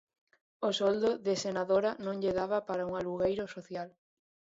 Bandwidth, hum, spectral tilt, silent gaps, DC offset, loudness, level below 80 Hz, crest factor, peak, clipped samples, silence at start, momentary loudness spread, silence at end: 8 kHz; none; -5 dB/octave; none; under 0.1%; -33 LUFS; -66 dBFS; 16 dB; -16 dBFS; under 0.1%; 0.6 s; 12 LU; 0.65 s